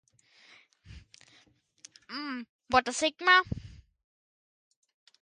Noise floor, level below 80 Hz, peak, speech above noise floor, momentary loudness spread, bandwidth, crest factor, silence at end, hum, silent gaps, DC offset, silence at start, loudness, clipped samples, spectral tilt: -65 dBFS; -58 dBFS; -8 dBFS; 38 dB; 19 LU; 11.5 kHz; 26 dB; 1.55 s; none; 2.49-2.59 s; under 0.1%; 0.9 s; -27 LUFS; under 0.1%; -2.5 dB/octave